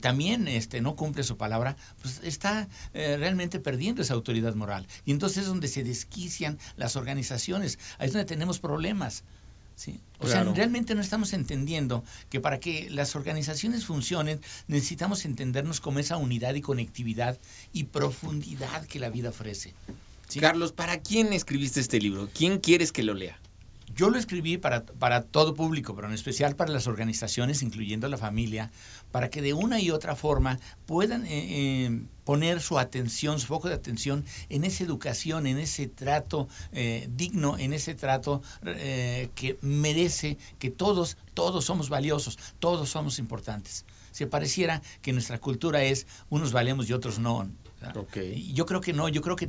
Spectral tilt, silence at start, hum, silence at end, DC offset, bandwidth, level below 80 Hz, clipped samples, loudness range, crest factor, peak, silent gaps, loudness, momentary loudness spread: -5 dB/octave; 0 s; none; 0 s; under 0.1%; 8 kHz; -48 dBFS; under 0.1%; 4 LU; 26 dB; -2 dBFS; none; -29 LUFS; 10 LU